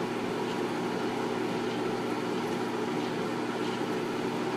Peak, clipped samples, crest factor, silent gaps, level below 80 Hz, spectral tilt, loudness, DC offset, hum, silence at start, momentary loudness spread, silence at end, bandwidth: -20 dBFS; under 0.1%; 12 dB; none; -70 dBFS; -5.5 dB/octave; -32 LUFS; under 0.1%; none; 0 s; 1 LU; 0 s; 15.5 kHz